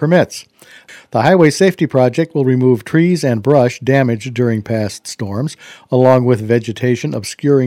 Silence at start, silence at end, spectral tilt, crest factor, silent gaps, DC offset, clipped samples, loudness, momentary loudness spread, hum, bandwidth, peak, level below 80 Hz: 0 s; 0 s; -6.5 dB/octave; 14 dB; none; under 0.1%; 0.3%; -14 LUFS; 11 LU; none; 15 kHz; 0 dBFS; -56 dBFS